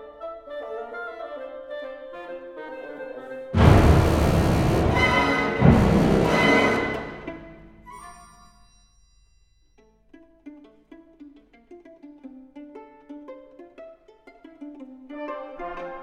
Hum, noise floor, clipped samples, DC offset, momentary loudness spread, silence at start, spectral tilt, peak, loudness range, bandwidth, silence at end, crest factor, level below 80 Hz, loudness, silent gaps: none; -59 dBFS; under 0.1%; under 0.1%; 26 LU; 0 s; -6.5 dB/octave; -2 dBFS; 22 LU; 16 kHz; 0 s; 22 dB; -34 dBFS; -21 LUFS; none